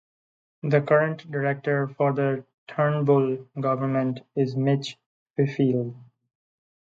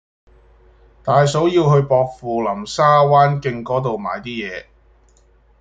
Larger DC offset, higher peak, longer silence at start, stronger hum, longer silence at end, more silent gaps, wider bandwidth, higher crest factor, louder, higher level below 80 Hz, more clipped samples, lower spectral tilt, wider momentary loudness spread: neither; second, -6 dBFS vs -2 dBFS; second, 0.65 s vs 1.05 s; neither; second, 0.8 s vs 1 s; first, 2.54-2.67 s, 5.06-5.34 s vs none; second, 7.6 kHz vs 9 kHz; about the same, 18 dB vs 16 dB; second, -25 LUFS vs -17 LUFS; second, -72 dBFS vs -50 dBFS; neither; first, -8 dB/octave vs -6.5 dB/octave; second, 10 LU vs 13 LU